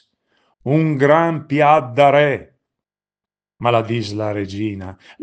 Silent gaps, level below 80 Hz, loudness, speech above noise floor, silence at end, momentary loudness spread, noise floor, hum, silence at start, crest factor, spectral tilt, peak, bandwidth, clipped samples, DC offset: none; -62 dBFS; -17 LUFS; over 74 dB; 0.3 s; 13 LU; under -90 dBFS; none; 0.65 s; 18 dB; -7.5 dB/octave; 0 dBFS; 8.8 kHz; under 0.1%; under 0.1%